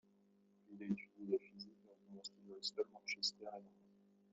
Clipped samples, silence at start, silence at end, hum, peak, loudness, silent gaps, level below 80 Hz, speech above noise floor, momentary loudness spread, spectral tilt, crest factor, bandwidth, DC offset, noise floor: under 0.1%; 0.7 s; 0.65 s; none; -28 dBFS; -45 LUFS; none; under -90 dBFS; 27 dB; 16 LU; -3 dB/octave; 22 dB; 7.6 kHz; under 0.1%; -74 dBFS